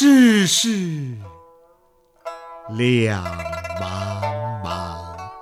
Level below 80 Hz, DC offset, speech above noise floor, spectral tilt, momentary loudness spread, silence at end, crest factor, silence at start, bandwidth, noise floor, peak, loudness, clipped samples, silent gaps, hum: -50 dBFS; under 0.1%; 36 dB; -4.5 dB/octave; 21 LU; 0 s; 16 dB; 0 s; 15.5 kHz; -58 dBFS; -4 dBFS; -20 LUFS; under 0.1%; none; none